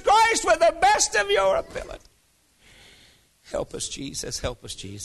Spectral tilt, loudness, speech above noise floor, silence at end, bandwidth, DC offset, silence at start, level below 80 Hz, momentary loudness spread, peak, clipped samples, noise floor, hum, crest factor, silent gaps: -1.5 dB/octave; -22 LUFS; 36 dB; 0 s; 12.5 kHz; under 0.1%; 0 s; -48 dBFS; 18 LU; -8 dBFS; under 0.1%; -63 dBFS; none; 16 dB; none